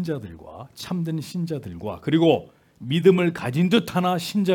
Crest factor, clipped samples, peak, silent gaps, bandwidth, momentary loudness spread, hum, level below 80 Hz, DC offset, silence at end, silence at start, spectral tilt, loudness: 18 dB; under 0.1%; -4 dBFS; none; 17.5 kHz; 19 LU; none; -60 dBFS; under 0.1%; 0 s; 0 s; -6.5 dB/octave; -23 LUFS